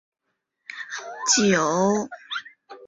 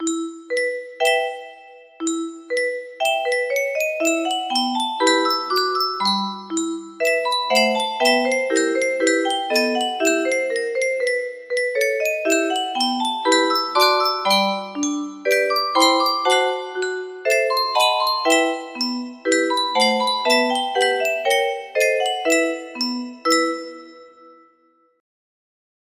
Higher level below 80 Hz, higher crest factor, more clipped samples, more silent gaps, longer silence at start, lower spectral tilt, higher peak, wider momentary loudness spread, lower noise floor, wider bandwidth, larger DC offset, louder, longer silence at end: first, -64 dBFS vs -72 dBFS; about the same, 20 dB vs 18 dB; neither; neither; first, 0.7 s vs 0 s; first, -3 dB/octave vs -1.5 dB/octave; second, -6 dBFS vs -2 dBFS; first, 16 LU vs 8 LU; first, -69 dBFS vs -60 dBFS; second, 8 kHz vs 15.5 kHz; neither; about the same, -22 LUFS vs -20 LUFS; second, 0 s vs 1.7 s